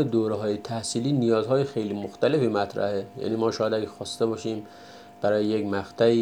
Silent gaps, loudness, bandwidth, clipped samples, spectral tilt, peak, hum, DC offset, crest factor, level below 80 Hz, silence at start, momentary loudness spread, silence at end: none; -26 LUFS; 14 kHz; under 0.1%; -6 dB/octave; -8 dBFS; none; under 0.1%; 18 dB; -68 dBFS; 0 s; 9 LU; 0 s